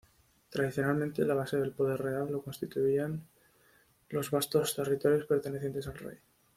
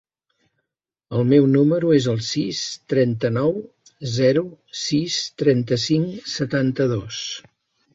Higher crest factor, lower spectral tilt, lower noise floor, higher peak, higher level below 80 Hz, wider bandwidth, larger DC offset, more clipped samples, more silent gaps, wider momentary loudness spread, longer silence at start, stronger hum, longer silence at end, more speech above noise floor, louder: about the same, 18 dB vs 18 dB; about the same, -5.5 dB/octave vs -5.5 dB/octave; second, -66 dBFS vs -83 dBFS; second, -14 dBFS vs -4 dBFS; second, -66 dBFS vs -58 dBFS; first, 16.5 kHz vs 8 kHz; neither; neither; neither; about the same, 10 LU vs 12 LU; second, 0.5 s vs 1.1 s; neither; second, 0.4 s vs 0.55 s; second, 34 dB vs 63 dB; second, -32 LUFS vs -21 LUFS